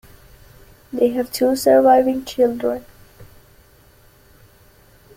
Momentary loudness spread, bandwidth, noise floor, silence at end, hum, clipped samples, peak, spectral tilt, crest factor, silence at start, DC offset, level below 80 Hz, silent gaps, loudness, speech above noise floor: 12 LU; 16.5 kHz; -51 dBFS; 1.9 s; none; under 0.1%; -2 dBFS; -4.5 dB/octave; 18 dB; 0.95 s; under 0.1%; -52 dBFS; none; -17 LUFS; 34 dB